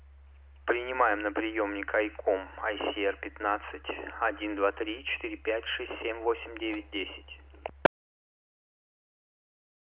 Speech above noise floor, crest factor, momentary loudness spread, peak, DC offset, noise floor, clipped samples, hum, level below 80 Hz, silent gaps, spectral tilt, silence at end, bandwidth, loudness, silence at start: 21 dB; 26 dB; 9 LU; -6 dBFS; under 0.1%; -53 dBFS; under 0.1%; none; -54 dBFS; none; -1.5 dB/octave; 2 s; 4 kHz; -32 LUFS; 0 s